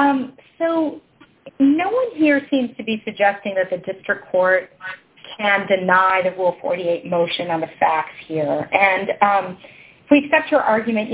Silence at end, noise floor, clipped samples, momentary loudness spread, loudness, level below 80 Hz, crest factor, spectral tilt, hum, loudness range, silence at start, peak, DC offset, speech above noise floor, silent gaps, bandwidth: 0 s; -45 dBFS; under 0.1%; 10 LU; -19 LUFS; -62 dBFS; 20 dB; -9 dB/octave; none; 2 LU; 0 s; 0 dBFS; under 0.1%; 26 dB; none; 4 kHz